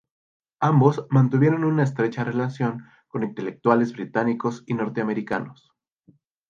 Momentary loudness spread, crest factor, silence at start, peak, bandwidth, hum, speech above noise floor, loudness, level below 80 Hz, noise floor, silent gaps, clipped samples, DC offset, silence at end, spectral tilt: 11 LU; 20 dB; 0.6 s; -4 dBFS; 7.2 kHz; none; 38 dB; -23 LUFS; -68 dBFS; -60 dBFS; none; under 0.1%; under 0.1%; 0.95 s; -9 dB/octave